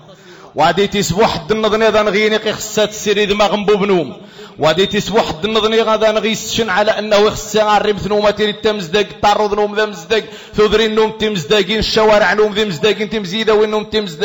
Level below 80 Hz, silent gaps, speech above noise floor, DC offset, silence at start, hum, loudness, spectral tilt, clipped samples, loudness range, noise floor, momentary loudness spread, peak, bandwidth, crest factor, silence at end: -40 dBFS; none; 25 dB; under 0.1%; 0.1 s; none; -14 LUFS; -4 dB/octave; under 0.1%; 1 LU; -38 dBFS; 5 LU; -4 dBFS; 17 kHz; 10 dB; 0 s